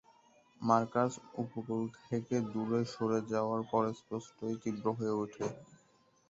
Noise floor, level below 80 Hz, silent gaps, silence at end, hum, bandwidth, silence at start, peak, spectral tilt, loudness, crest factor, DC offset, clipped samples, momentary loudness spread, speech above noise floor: -69 dBFS; -74 dBFS; none; 0.55 s; none; 8 kHz; 0.6 s; -14 dBFS; -7 dB/octave; -35 LUFS; 22 dB; under 0.1%; under 0.1%; 10 LU; 34 dB